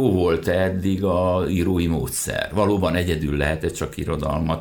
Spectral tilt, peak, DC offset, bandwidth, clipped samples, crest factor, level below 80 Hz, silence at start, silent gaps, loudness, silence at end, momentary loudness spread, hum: -6 dB/octave; -6 dBFS; under 0.1%; 19 kHz; under 0.1%; 14 dB; -36 dBFS; 0 s; none; -22 LUFS; 0 s; 5 LU; none